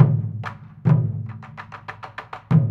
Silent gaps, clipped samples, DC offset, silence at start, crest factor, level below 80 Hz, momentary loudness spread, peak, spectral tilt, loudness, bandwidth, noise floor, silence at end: none; under 0.1%; under 0.1%; 0 s; 20 dB; -52 dBFS; 17 LU; 0 dBFS; -10 dB/octave; -22 LUFS; 4.8 kHz; -39 dBFS; 0 s